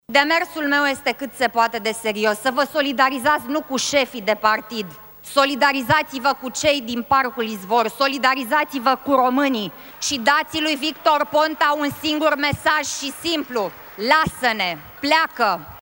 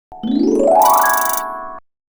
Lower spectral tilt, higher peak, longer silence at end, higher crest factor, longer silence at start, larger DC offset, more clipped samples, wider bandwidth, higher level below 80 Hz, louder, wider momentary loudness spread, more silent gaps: about the same, -3 dB/octave vs -3 dB/octave; about the same, -2 dBFS vs -2 dBFS; second, 0.05 s vs 0.3 s; about the same, 18 dB vs 14 dB; about the same, 0.1 s vs 0.1 s; neither; neither; about the same, over 20 kHz vs over 20 kHz; about the same, -54 dBFS vs -50 dBFS; second, -20 LUFS vs -14 LUFS; second, 7 LU vs 17 LU; neither